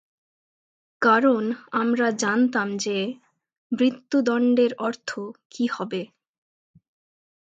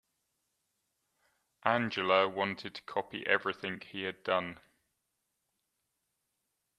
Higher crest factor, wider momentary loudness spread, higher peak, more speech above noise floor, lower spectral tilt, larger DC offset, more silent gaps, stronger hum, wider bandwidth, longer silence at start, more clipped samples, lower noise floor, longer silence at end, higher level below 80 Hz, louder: second, 20 dB vs 26 dB; about the same, 13 LU vs 11 LU; first, -6 dBFS vs -10 dBFS; first, over 67 dB vs 50 dB; about the same, -4.5 dB/octave vs -5.5 dB/octave; neither; first, 3.58-3.70 s, 5.45-5.50 s vs none; neither; second, 8.8 kHz vs 12 kHz; second, 1 s vs 1.65 s; neither; first, under -90 dBFS vs -83 dBFS; second, 1.35 s vs 2.25 s; about the same, -76 dBFS vs -78 dBFS; first, -23 LUFS vs -33 LUFS